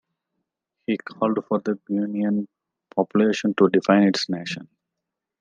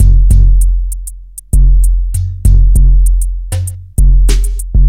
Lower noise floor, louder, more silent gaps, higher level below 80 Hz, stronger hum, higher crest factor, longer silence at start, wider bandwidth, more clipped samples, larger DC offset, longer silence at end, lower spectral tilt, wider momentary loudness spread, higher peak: first, -84 dBFS vs -27 dBFS; second, -22 LUFS vs -12 LUFS; neither; second, -74 dBFS vs -8 dBFS; neither; first, 20 dB vs 8 dB; first, 0.9 s vs 0 s; second, 8.8 kHz vs 13.5 kHz; second, under 0.1% vs 0.4%; neither; first, 0.8 s vs 0 s; about the same, -6 dB/octave vs -6 dB/octave; about the same, 12 LU vs 10 LU; second, -4 dBFS vs 0 dBFS